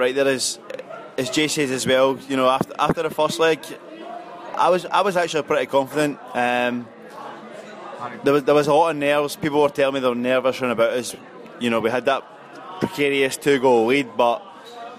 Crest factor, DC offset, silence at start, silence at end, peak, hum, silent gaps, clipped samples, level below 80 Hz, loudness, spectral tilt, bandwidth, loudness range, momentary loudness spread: 16 dB; under 0.1%; 0 s; 0 s; -6 dBFS; none; none; under 0.1%; -62 dBFS; -20 LUFS; -4 dB/octave; 15.5 kHz; 3 LU; 19 LU